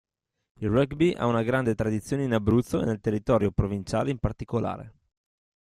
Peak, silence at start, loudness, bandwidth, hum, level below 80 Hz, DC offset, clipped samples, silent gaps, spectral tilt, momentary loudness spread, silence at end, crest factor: -8 dBFS; 0.6 s; -26 LUFS; 13 kHz; none; -46 dBFS; under 0.1%; under 0.1%; none; -7.5 dB/octave; 6 LU; 0.75 s; 18 dB